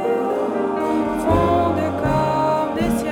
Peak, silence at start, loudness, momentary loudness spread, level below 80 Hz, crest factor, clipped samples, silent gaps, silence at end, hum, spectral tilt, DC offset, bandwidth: -6 dBFS; 0 s; -20 LUFS; 4 LU; -38 dBFS; 12 dB; under 0.1%; none; 0 s; none; -7 dB/octave; under 0.1%; 19 kHz